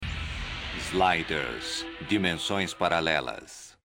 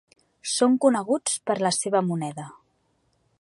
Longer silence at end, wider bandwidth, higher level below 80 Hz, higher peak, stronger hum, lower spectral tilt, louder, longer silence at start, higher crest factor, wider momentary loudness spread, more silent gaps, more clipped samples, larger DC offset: second, 0.15 s vs 0.9 s; first, 16 kHz vs 11.5 kHz; first, -46 dBFS vs -76 dBFS; about the same, -8 dBFS vs -6 dBFS; neither; about the same, -4 dB/octave vs -4 dB/octave; second, -28 LUFS vs -24 LUFS; second, 0 s vs 0.45 s; about the same, 22 dB vs 20 dB; second, 10 LU vs 16 LU; neither; neither; neither